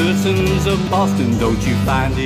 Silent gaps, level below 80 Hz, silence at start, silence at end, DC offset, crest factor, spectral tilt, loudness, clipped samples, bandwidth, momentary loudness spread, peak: none; -28 dBFS; 0 s; 0 s; under 0.1%; 10 dB; -6 dB/octave; -16 LUFS; under 0.1%; 16 kHz; 1 LU; -4 dBFS